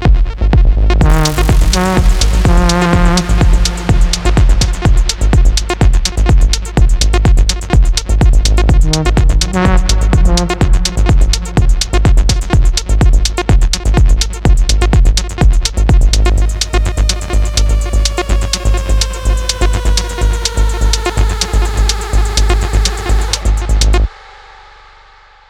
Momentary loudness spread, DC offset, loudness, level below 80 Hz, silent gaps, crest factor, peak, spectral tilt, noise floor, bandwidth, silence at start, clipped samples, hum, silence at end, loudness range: 4 LU; under 0.1%; -13 LUFS; -10 dBFS; none; 10 dB; 0 dBFS; -4.5 dB/octave; -41 dBFS; 13 kHz; 0 s; under 0.1%; none; 1.4 s; 3 LU